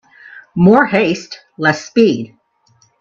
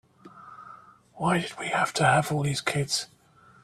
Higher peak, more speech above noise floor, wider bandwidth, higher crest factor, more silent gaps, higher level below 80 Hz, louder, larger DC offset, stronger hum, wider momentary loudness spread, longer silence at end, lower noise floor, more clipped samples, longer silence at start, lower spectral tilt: first, 0 dBFS vs -8 dBFS; first, 43 dB vs 25 dB; second, 7.4 kHz vs 14 kHz; second, 16 dB vs 22 dB; neither; first, -52 dBFS vs -60 dBFS; first, -14 LUFS vs -26 LUFS; neither; neither; second, 16 LU vs 24 LU; first, 0.75 s vs 0.6 s; first, -56 dBFS vs -51 dBFS; neither; about the same, 0.35 s vs 0.25 s; first, -6.5 dB/octave vs -4 dB/octave